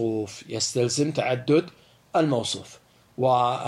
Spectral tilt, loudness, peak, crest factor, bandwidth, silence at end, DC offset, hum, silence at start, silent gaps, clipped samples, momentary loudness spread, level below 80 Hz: -4.5 dB/octave; -25 LUFS; -10 dBFS; 16 dB; 12.5 kHz; 0 s; under 0.1%; none; 0 s; none; under 0.1%; 11 LU; -68 dBFS